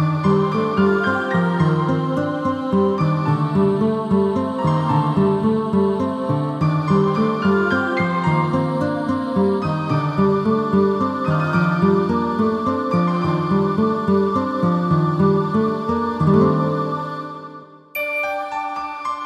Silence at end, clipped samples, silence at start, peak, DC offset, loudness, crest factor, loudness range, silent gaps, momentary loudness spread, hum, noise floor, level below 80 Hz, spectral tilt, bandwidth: 0 s; under 0.1%; 0 s; -4 dBFS; under 0.1%; -19 LUFS; 14 dB; 1 LU; none; 5 LU; none; -39 dBFS; -52 dBFS; -8.5 dB/octave; 13.5 kHz